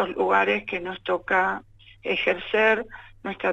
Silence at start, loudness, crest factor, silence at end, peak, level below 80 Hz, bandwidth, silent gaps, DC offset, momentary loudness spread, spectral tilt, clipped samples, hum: 0 s; -23 LUFS; 18 dB; 0 s; -6 dBFS; -56 dBFS; 8 kHz; none; under 0.1%; 15 LU; -5.5 dB/octave; under 0.1%; none